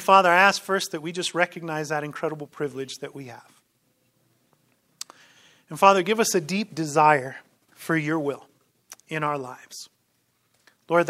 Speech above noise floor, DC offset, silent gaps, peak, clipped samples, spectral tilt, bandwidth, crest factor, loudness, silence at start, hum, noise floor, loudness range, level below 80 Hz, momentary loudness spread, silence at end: 46 dB; under 0.1%; none; 0 dBFS; under 0.1%; -4 dB/octave; 16 kHz; 24 dB; -23 LUFS; 0 s; none; -70 dBFS; 13 LU; -78 dBFS; 22 LU; 0 s